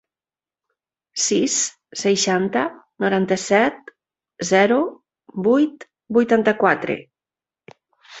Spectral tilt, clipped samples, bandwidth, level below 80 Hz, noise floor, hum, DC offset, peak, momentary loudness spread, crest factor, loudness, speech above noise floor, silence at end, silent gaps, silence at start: -3.5 dB/octave; under 0.1%; 8.4 kHz; -64 dBFS; under -90 dBFS; none; under 0.1%; -2 dBFS; 11 LU; 20 dB; -19 LUFS; over 71 dB; 0 s; none; 1.15 s